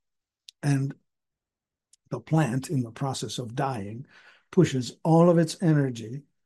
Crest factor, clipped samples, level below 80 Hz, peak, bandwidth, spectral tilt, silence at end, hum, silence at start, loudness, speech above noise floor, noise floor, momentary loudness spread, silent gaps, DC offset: 20 dB; under 0.1%; -66 dBFS; -8 dBFS; 12.5 kHz; -7 dB/octave; 0.25 s; none; 0.65 s; -26 LUFS; 65 dB; -90 dBFS; 17 LU; none; under 0.1%